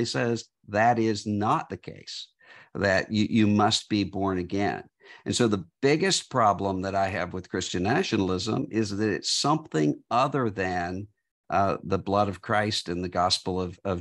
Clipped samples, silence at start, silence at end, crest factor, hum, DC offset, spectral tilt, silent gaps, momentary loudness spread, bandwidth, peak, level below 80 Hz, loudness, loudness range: under 0.1%; 0 s; 0 s; 18 dB; none; under 0.1%; -4.5 dB/octave; 11.31-11.44 s; 10 LU; 12 kHz; -8 dBFS; -60 dBFS; -26 LUFS; 2 LU